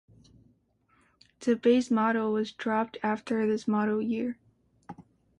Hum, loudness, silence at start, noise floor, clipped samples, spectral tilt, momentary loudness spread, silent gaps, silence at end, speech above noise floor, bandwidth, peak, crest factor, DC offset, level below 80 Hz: none; -28 LUFS; 1.4 s; -68 dBFS; under 0.1%; -6 dB/octave; 17 LU; none; 0.4 s; 41 dB; 9.6 kHz; -12 dBFS; 18 dB; under 0.1%; -70 dBFS